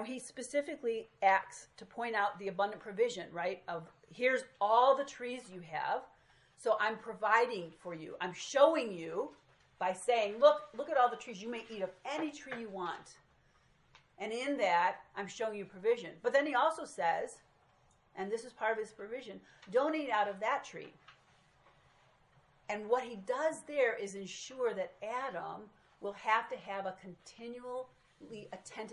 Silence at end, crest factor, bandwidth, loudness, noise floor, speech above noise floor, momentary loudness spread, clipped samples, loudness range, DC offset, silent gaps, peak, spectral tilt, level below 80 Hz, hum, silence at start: 0 s; 22 dB; 11.5 kHz; -35 LUFS; -69 dBFS; 34 dB; 16 LU; under 0.1%; 7 LU; under 0.1%; none; -14 dBFS; -3.5 dB/octave; -78 dBFS; none; 0 s